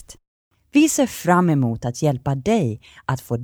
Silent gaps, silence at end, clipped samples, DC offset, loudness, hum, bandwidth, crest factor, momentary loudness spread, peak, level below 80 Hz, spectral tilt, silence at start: 0.28-0.51 s; 0 s; under 0.1%; under 0.1%; -20 LUFS; none; over 20 kHz; 16 dB; 10 LU; -4 dBFS; -50 dBFS; -6 dB/octave; 0.1 s